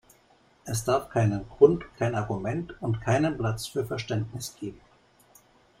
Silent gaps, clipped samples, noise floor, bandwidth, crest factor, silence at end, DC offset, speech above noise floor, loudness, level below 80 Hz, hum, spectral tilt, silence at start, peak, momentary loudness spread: none; under 0.1%; -61 dBFS; 16 kHz; 22 dB; 1.05 s; under 0.1%; 35 dB; -27 LUFS; -54 dBFS; none; -6 dB/octave; 0.65 s; -6 dBFS; 15 LU